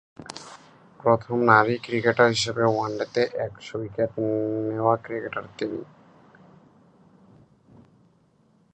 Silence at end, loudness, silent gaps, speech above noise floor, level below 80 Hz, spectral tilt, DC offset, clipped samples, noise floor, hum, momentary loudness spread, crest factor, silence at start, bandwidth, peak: 2.9 s; -24 LUFS; none; 38 dB; -62 dBFS; -5 dB/octave; under 0.1%; under 0.1%; -62 dBFS; none; 17 LU; 24 dB; 0.2 s; 10.5 kHz; -2 dBFS